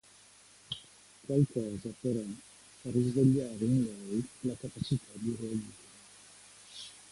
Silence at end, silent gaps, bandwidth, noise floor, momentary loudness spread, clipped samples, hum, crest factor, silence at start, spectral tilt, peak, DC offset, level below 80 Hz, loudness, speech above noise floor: 0.1 s; none; 11.5 kHz; -59 dBFS; 24 LU; under 0.1%; none; 20 dB; 0.7 s; -7 dB/octave; -14 dBFS; under 0.1%; -64 dBFS; -33 LUFS; 27 dB